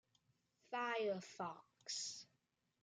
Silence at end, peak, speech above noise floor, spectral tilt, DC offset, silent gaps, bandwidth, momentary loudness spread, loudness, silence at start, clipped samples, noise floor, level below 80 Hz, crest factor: 0.6 s; -32 dBFS; 41 dB; -2.5 dB/octave; under 0.1%; none; 11 kHz; 15 LU; -45 LUFS; 0.7 s; under 0.1%; -85 dBFS; under -90 dBFS; 16 dB